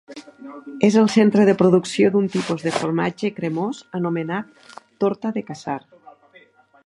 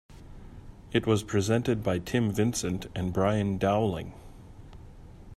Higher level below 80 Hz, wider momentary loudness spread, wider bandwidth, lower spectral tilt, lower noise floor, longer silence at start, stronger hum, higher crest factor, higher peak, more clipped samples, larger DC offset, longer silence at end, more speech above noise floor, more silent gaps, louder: second, -64 dBFS vs -50 dBFS; about the same, 19 LU vs 19 LU; second, 11.5 kHz vs 14.5 kHz; about the same, -6.5 dB/octave vs -6 dB/octave; first, -52 dBFS vs -47 dBFS; about the same, 0.1 s vs 0.1 s; neither; about the same, 18 dB vs 20 dB; first, -2 dBFS vs -10 dBFS; neither; neither; first, 1.1 s vs 0 s; first, 33 dB vs 20 dB; neither; first, -20 LUFS vs -28 LUFS